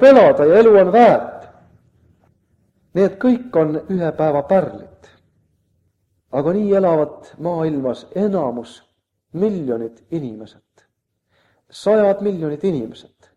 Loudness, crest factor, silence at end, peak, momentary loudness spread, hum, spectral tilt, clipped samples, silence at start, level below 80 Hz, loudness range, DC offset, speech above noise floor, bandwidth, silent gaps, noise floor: -16 LUFS; 18 dB; 0.45 s; 0 dBFS; 17 LU; none; -8 dB/octave; under 0.1%; 0 s; -58 dBFS; 9 LU; under 0.1%; 54 dB; 10.5 kHz; none; -69 dBFS